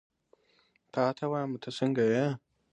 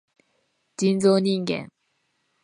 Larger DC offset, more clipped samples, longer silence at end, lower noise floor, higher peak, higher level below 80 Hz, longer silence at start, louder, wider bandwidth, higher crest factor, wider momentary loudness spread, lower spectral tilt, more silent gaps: neither; neither; second, 0.35 s vs 0.75 s; about the same, -69 dBFS vs -72 dBFS; second, -14 dBFS vs -6 dBFS; second, -76 dBFS vs -68 dBFS; first, 0.95 s vs 0.8 s; second, -31 LUFS vs -22 LUFS; about the same, 10.5 kHz vs 10.5 kHz; about the same, 18 dB vs 18 dB; second, 10 LU vs 20 LU; about the same, -7 dB/octave vs -6 dB/octave; neither